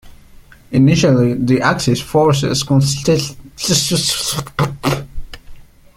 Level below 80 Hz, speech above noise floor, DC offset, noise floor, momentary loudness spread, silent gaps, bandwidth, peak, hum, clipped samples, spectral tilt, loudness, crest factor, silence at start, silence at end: -38 dBFS; 27 dB; under 0.1%; -41 dBFS; 9 LU; none; 16.5 kHz; 0 dBFS; none; under 0.1%; -5 dB/octave; -15 LUFS; 16 dB; 0.05 s; 0.35 s